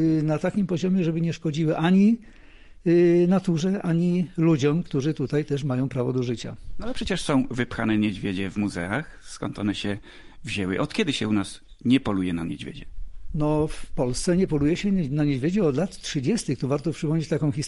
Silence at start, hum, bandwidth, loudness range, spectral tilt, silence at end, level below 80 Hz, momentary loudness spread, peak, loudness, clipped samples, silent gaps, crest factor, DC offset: 0 s; none; 11.5 kHz; 5 LU; -6.5 dB/octave; 0 s; -44 dBFS; 11 LU; -10 dBFS; -24 LUFS; under 0.1%; none; 14 dB; under 0.1%